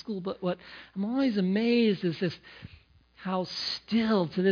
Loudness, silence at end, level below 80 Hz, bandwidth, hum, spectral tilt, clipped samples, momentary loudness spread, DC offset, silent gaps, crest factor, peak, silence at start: -29 LUFS; 0 s; -64 dBFS; 5.4 kHz; none; -7 dB/octave; under 0.1%; 16 LU; under 0.1%; none; 16 dB; -14 dBFS; 0.05 s